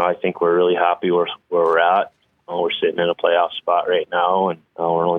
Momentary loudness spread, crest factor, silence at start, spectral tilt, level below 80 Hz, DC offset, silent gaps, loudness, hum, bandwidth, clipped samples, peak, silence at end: 7 LU; 16 dB; 0 s; -7.5 dB/octave; -70 dBFS; under 0.1%; none; -19 LUFS; none; 3.9 kHz; under 0.1%; -4 dBFS; 0 s